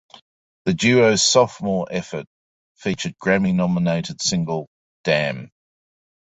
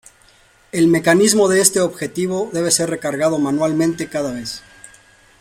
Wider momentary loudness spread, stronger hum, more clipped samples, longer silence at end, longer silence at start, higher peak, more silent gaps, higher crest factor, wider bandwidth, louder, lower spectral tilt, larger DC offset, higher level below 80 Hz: first, 14 LU vs 11 LU; neither; neither; about the same, 0.75 s vs 0.8 s; about the same, 0.65 s vs 0.75 s; about the same, -2 dBFS vs 0 dBFS; first, 2.27-2.75 s, 4.67-5.04 s vs none; about the same, 20 dB vs 18 dB; second, 8.4 kHz vs 16.5 kHz; second, -20 LUFS vs -17 LUFS; about the same, -4 dB/octave vs -4 dB/octave; neither; about the same, -54 dBFS vs -54 dBFS